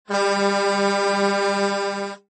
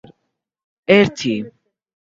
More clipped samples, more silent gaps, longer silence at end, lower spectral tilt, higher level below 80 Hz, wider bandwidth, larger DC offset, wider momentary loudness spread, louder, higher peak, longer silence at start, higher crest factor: neither; neither; second, 0.15 s vs 0.65 s; second, -4 dB/octave vs -5.5 dB/octave; second, -70 dBFS vs -56 dBFS; first, 8.8 kHz vs 7.6 kHz; neither; second, 5 LU vs 19 LU; second, -21 LUFS vs -16 LUFS; second, -8 dBFS vs 0 dBFS; second, 0.1 s vs 0.9 s; second, 14 dB vs 20 dB